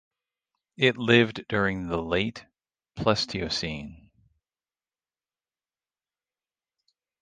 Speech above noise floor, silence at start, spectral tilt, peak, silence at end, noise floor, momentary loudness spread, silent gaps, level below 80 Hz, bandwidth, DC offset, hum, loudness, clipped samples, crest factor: over 64 dB; 0.8 s; -5 dB/octave; -6 dBFS; 3.25 s; under -90 dBFS; 17 LU; none; -52 dBFS; 9.6 kHz; under 0.1%; none; -25 LUFS; under 0.1%; 24 dB